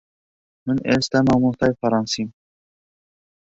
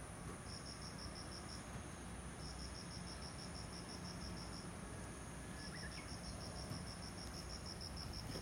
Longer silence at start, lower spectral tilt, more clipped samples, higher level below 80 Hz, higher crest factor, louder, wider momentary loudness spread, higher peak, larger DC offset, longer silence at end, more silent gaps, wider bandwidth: first, 0.65 s vs 0 s; first, -5.5 dB/octave vs -4 dB/octave; neither; first, -50 dBFS vs -58 dBFS; first, 20 dB vs 14 dB; first, -20 LUFS vs -50 LUFS; first, 9 LU vs 2 LU; first, -4 dBFS vs -34 dBFS; neither; first, 1.15 s vs 0 s; neither; second, 8 kHz vs 16 kHz